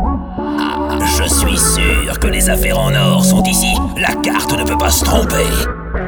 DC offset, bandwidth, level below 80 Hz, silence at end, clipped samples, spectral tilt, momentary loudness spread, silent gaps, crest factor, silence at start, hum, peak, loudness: under 0.1%; over 20 kHz; -20 dBFS; 0 s; under 0.1%; -4 dB/octave; 7 LU; none; 14 dB; 0 s; none; 0 dBFS; -13 LUFS